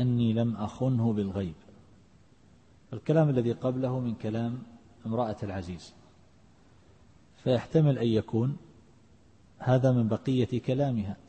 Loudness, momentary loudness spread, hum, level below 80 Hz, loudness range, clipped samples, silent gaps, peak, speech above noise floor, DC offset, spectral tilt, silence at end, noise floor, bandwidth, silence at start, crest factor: -29 LUFS; 14 LU; none; -60 dBFS; 7 LU; under 0.1%; none; -12 dBFS; 32 dB; under 0.1%; -9 dB/octave; 0.15 s; -60 dBFS; 8.6 kHz; 0 s; 16 dB